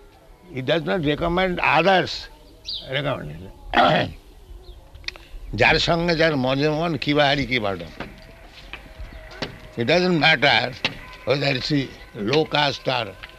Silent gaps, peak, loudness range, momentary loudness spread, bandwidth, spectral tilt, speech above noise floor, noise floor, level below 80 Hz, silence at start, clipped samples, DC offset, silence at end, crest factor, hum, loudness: none; -2 dBFS; 4 LU; 20 LU; 13.5 kHz; -5.5 dB/octave; 27 dB; -48 dBFS; -42 dBFS; 0.3 s; under 0.1%; under 0.1%; 0 s; 20 dB; none; -20 LUFS